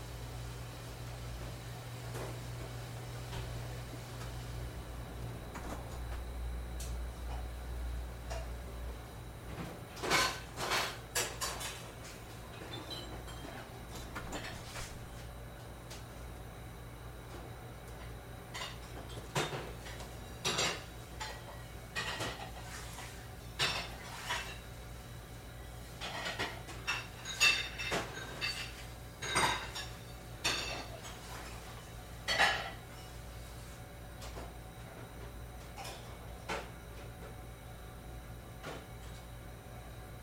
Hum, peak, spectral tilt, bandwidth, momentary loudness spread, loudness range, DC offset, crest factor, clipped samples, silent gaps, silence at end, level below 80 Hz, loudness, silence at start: 60 Hz at -50 dBFS; -14 dBFS; -3 dB/octave; 16 kHz; 15 LU; 12 LU; under 0.1%; 26 dB; under 0.1%; none; 0 s; -50 dBFS; -40 LUFS; 0 s